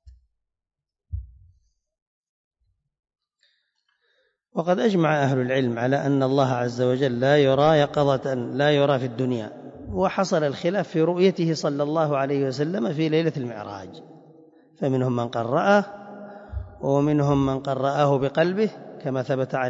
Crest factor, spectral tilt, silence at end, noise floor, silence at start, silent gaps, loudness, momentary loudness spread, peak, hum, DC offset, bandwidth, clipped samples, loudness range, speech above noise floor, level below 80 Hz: 18 dB; -7 dB/octave; 0 s; -87 dBFS; 0.05 s; 2.02-2.51 s; -23 LUFS; 16 LU; -6 dBFS; none; under 0.1%; 7.8 kHz; under 0.1%; 5 LU; 65 dB; -50 dBFS